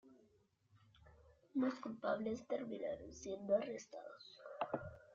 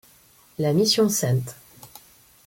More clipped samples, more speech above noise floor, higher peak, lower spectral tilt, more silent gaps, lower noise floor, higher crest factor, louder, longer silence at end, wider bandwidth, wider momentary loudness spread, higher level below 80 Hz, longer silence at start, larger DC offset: neither; about the same, 33 dB vs 34 dB; second, -24 dBFS vs -8 dBFS; about the same, -5 dB/octave vs -4.5 dB/octave; neither; first, -75 dBFS vs -55 dBFS; about the same, 20 dB vs 16 dB; second, -43 LUFS vs -21 LUFS; second, 0 s vs 0.6 s; second, 7.6 kHz vs 17 kHz; about the same, 15 LU vs 17 LU; second, -74 dBFS vs -62 dBFS; second, 0.05 s vs 0.6 s; neither